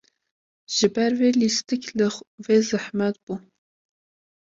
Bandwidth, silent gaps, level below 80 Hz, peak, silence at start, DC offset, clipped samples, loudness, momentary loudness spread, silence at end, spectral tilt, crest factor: 7.8 kHz; 2.27-2.38 s, 3.23-3.27 s; -68 dBFS; -6 dBFS; 0.7 s; under 0.1%; under 0.1%; -22 LUFS; 14 LU; 1.15 s; -4 dB/octave; 18 dB